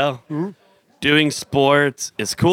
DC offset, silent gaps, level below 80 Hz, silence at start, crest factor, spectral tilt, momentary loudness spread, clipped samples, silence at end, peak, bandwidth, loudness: under 0.1%; none; -54 dBFS; 0 s; 16 dB; -4.5 dB/octave; 11 LU; under 0.1%; 0 s; -2 dBFS; 17 kHz; -19 LUFS